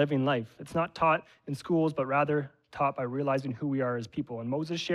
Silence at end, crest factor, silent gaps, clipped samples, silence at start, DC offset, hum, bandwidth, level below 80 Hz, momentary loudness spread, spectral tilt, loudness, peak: 0 s; 16 dB; none; under 0.1%; 0 s; under 0.1%; none; 12.5 kHz; -66 dBFS; 8 LU; -7 dB/octave; -30 LUFS; -12 dBFS